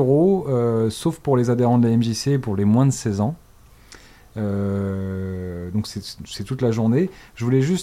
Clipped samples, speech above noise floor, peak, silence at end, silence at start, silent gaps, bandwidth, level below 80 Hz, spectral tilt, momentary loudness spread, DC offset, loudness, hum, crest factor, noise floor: under 0.1%; 28 dB; -6 dBFS; 0 s; 0 s; none; 15 kHz; -50 dBFS; -7 dB/octave; 12 LU; under 0.1%; -21 LUFS; none; 14 dB; -48 dBFS